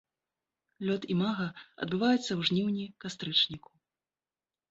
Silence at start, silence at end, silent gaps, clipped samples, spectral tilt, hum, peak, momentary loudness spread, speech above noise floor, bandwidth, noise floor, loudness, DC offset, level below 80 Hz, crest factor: 0.8 s; 1.15 s; none; under 0.1%; -5.5 dB/octave; none; -14 dBFS; 12 LU; over 59 dB; 8 kHz; under -90 dBFS; -31 LUFS; under 0.1%; -70 dBFS; 20 dB